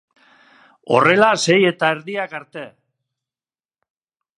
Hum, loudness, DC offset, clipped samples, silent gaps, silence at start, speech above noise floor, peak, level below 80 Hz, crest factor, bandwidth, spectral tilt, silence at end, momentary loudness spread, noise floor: none; -16 LUFS; under 0.1%; under 0.1%; none; 0.85 s; over 73 dB; 0 dBFS; -68 dBFS; 20 dB; 11.5 kHz; -4 dB/octave; 1.7 s; 21 LU; under -90 dBFS